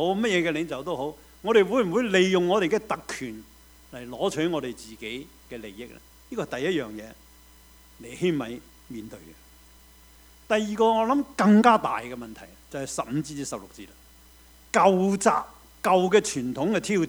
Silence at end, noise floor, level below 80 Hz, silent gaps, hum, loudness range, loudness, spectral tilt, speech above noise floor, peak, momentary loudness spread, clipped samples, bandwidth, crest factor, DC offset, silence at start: 0 s; -53 dBFS; -56 dBFS; none; none; 10 LU; -24 LUFS; -5 dB/octave; 28 dB; -4 dBFS; 22 LU; under 0.1%; over 20 kHz; 22 dB; under 0.1%; 0 s